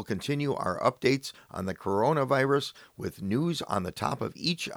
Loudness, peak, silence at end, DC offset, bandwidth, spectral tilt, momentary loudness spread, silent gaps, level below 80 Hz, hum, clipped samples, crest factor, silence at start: -29 LUFS; -10 dBFS; 0 s; under 0.1%; over 20 kHz; -5.5 dB/octave; 11 LU; none; -62 dBFS; none; under 0.1%; 20 dB; 0 s